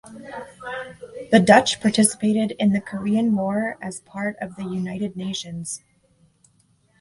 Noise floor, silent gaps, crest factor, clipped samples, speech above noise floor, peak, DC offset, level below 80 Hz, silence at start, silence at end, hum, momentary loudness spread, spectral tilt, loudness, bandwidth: -62 dBFS; none; 22 dB; under 0.1%; 41 dB; 0 dBFS; under 0.1%; -58 dBFS; 0.05 s; 1.25 s; none; 20 LU; -4.5 dB/octave; -21 LUFS; 11.5 kHz